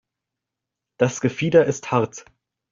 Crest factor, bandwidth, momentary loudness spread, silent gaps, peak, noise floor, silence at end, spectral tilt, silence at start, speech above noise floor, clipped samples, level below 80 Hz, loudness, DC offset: 20 dB; 7.6 kHz; 9 LU; none; -4 dBFS; -85 dBFS; 0.5 s; -6 dB/octave; 1 s; 65 dB; under 0.1%; -60 dBFS; -21 LUFS; under 0.1%